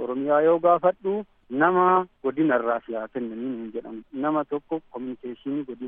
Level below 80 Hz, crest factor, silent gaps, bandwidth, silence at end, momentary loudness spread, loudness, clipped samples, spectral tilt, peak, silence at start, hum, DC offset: -66 dBFS; 18 dB; none; 3.8 kHz; 0 s; 15 LU; -24 LUFS; under 0.1%; -5.5 dB/octave; -6 dBFS; 0 s; none; under 0.1%